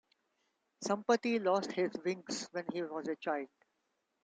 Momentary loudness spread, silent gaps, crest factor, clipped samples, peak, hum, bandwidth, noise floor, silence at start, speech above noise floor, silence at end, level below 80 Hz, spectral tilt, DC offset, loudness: 8 LU; none; 20 dB; under 0.1%; -18 dBFS; none; 9.4 kHz; -82 dBFS; 0.8 s; 47 dB; 0.8 s; -84 dBFS; -4 dB/octave; under 0.1%; -36 LUFS